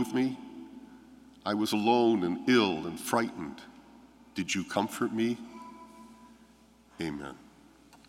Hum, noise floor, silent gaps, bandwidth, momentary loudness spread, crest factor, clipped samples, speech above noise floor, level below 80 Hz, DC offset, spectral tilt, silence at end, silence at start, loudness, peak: none; -60 dBFS; none; 16 kHz; 23 LU; 22 dB; under 0.1%; 30 dB; -68 dBFS; under 0.1%; -4.5 dB/octave; 0.7 s; 0 s; -30 LUFS; -10 dBFS